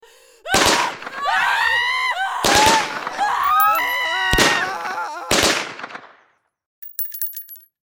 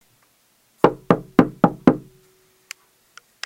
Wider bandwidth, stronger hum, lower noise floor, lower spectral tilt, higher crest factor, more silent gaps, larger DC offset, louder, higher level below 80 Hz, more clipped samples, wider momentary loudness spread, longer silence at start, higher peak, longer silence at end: first, 18.5 kHz vs 15.5 kHz; neither; about the same, -60 dBFS vs -62 dBFS; second, -1.5 dB/octave vs -7.5 dB/octave; about the same, 20 dB vs 22 dB; first, 6.66-6.82 s vs none; neither; about the same, -18 LUFS vs -19 LUFS; first, -42 dBFS vs -50 dBFS; second, under 0.1% vs 0.1%; second, 17 LU vs 23 LU; second, 0.45 s vs 0.85 s; about the same, 0 dBFS vs 0 dBFS; second, 0.3 s vs 1.45 s